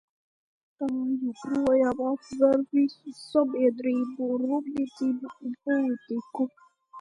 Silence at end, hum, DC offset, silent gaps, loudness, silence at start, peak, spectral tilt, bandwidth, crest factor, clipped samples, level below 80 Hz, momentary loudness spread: 0 s; none; under 0.1%; none; -27 LUFS; 0.8 s; -10 dBFS; -6.5 dB/octave; 10.5 kHz; 18 dB; under 0.1%; -66 dBFS; 10 LU